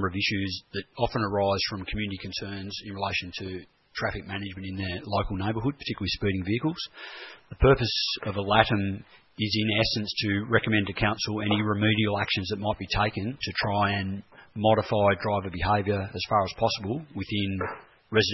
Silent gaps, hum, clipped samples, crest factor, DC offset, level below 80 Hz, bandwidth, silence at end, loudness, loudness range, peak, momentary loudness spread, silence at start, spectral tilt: none; none; under 0.1%; 24 dB; under 0.1%; -44 dBFS; 6 kHz; 0 s; -27 LUFS; 6 LU; -4 dBFS; 12 LU; 0 s; -6 dB/octave